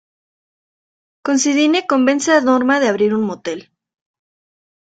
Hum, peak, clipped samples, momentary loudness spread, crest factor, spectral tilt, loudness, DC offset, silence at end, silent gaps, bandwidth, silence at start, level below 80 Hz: none; -2 dBFS; under 0.1%; 13 LU; 16 dB; -3.5 dB/octave; -15 LUFS; under 0.1%; 1.25 s; none; 9.2 kHz; 1.25 s; -64 dBFS